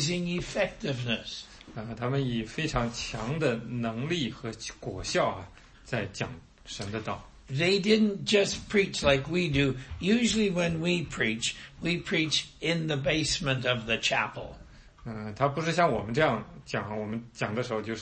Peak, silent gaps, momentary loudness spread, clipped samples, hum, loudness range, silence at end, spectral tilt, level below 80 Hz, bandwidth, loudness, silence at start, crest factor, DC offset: -8 dBFS; none; 13 LU; under 0.1%; none; 6 LU; 0 s; -4.5 dB/octave; -50 dBFS; 8.8 kHz; -29 LUFS; 0 s; 20 dB; under 0.1%